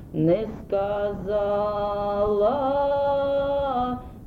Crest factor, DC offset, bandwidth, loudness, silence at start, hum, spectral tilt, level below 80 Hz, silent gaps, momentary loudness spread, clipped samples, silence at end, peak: 14 dB; under 0.1%; 5 kHz; -24 LUFS; 0 s; none; -9 dB/octave; -44 dBFS; none; 5 LU; under 0.1%; 0 s; -10 dBFS